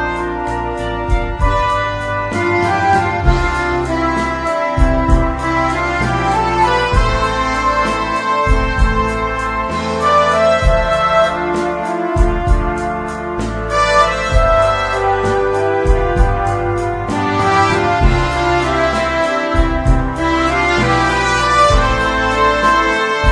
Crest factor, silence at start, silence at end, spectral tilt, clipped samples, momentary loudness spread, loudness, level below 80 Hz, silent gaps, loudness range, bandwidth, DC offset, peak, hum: 14 dB; 0 s; 0 s; -5.5 dB/octave; under 0.1%; 6 LU; -15 LUFS; -20 dBFS; none; 2 LU; 10.5 kHz; under 0.1%; 0 dBFS; none